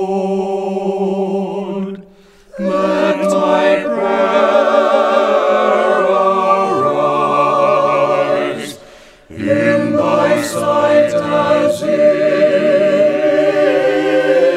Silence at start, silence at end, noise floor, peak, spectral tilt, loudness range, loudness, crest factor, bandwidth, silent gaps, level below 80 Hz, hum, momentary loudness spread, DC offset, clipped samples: 0 s; 0 s; -44 dBFS; 0 dBFS; -5.5 dB/octave; 4 LU; -13 LUFS; 14 dB; 13.5 kHz; none; -56 dBFS; none; 7 LU; under 0.1%; under 0.1%